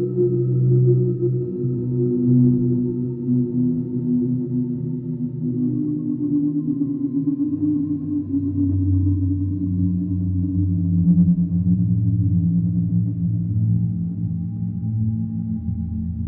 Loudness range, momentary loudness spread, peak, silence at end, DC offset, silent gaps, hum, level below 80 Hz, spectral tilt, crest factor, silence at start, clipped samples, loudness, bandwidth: 3 LU; 8 LU; -6 dBFS; 0 s; under 0.1%; none; none; -44 dBFS; -17 dB/octave; 14 dB; 0 s; under 0.1%; -21 LUFS; 1.4 kHz